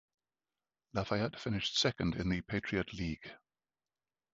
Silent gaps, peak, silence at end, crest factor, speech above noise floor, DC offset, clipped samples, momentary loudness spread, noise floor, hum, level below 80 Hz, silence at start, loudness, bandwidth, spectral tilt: none; -16 dBFS; 0.95 s; 22 dB; over 54 dB; under 0.1%; under 0.1%; 10 LU; under -90 dBFS; none; -56 dBFS; 0.95 s; -36 LUFS; 7.6 kHz; -4 dB/octave